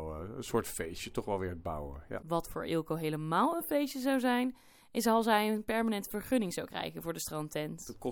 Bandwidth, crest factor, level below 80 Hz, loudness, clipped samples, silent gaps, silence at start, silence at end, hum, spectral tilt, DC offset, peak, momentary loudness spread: 19 kHz; 18 dB; -56 dBFS; -34 LUFS; under 0.1%; none; 0 s; 0 s; none; -5 dB/octave; under 0.1%; -16 dBFS; 11 LU